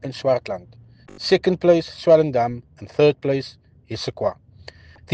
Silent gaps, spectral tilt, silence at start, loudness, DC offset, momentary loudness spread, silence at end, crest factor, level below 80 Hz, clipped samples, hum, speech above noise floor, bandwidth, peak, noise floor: none; -6.5 dB/octave; 0.05 s; -20 LUFS; under 0.1%; 17 LU; 0 s; 18 dB; -54 dBFS; under 0.1%; none; 25 dB; 9 kHz; -4 dBFS; -45 dBFS